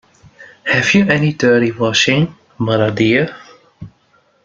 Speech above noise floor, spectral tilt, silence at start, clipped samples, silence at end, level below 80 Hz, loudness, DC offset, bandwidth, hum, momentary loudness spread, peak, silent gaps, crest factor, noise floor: 42 dB; -5 dB/octave; 0.4 s; under 0.1%; 0.55 s; -50 dBFS; -14 LUFS; under 0.1%; 7.8 kHz; none; 10 LU; 0 dBFS; none; 16 dB; -56 dBFS